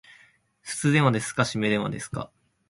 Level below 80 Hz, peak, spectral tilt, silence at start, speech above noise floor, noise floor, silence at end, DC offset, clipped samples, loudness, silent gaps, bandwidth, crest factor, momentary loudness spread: -58 dBFS; -6 dBFS; -5 dB/octave; 0.65 s; 35 dB; -59 dBFS; 0.45 s; under 0.1%; under 0.1%; -25 LUFS; none; 11.5 kHz; 22 dB; 16 LU